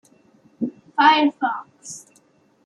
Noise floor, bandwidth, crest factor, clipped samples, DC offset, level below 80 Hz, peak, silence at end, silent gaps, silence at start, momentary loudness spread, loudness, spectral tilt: -58 dBFS; 12 kHz; 20 dB; under 0.1%; under 0.1%; -76 dBFS; -2 dBFS; 0.65 s; none; 0.6 s; 22 LU; -19 LUFS; -2.5 dB/octave